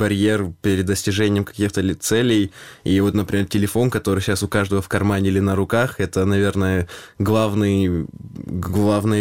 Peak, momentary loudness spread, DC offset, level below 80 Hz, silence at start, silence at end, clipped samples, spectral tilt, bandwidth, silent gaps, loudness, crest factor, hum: -4 dBFS; 6 LU; 0.3%; -44 dBFS; 0 s; 0 s; under 0.1%; -6 dB/octave; 17 kHz; none; -20 LUFS; 16 dB; none